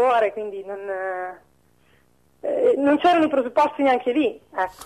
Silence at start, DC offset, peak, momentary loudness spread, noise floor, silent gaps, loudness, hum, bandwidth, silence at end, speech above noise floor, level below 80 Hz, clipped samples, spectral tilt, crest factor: 0 s; under 0.1%; -8 dBFS; 14 LU; -60 dBFS; none; -21 LUFS; none; 12.5 kHz; 0 s; 39 dB; -64 dBFS; under 0.1%; -5 dB/octave; 14 dB